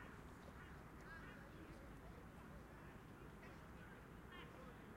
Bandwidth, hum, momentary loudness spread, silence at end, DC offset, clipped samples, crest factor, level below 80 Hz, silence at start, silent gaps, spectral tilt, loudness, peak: 16 kHz; none; 2 LU; 0 s; under 0.1%; under 0.1%; 14 dB; -66 dBFS; 0 s; none; -6 dB/octave; -59 LUFS; -44 dBFS